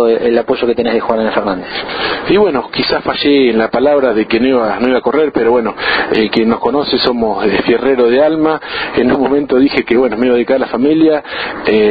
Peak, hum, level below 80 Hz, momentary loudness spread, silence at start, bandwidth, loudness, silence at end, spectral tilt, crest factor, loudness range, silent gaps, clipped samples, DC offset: 0 dBFS; none; -42 dBFS; 5 LU; 0 s; 5 kHz; -12 LUFS; 0 s; -8 dB/octave; 12 dB; 1 LU; none; under 0.1%; under 0.1%